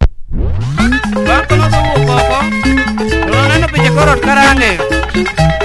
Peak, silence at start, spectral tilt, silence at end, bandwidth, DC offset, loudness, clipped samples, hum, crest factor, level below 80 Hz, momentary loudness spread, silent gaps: 0 dBFS; 0 s; -5.5 dB/octave; 0 s; 12 kHz; under 0.1%; -11 LUFS; 0.3%; none; 10 dB; -18 dBFS; 7 LU; none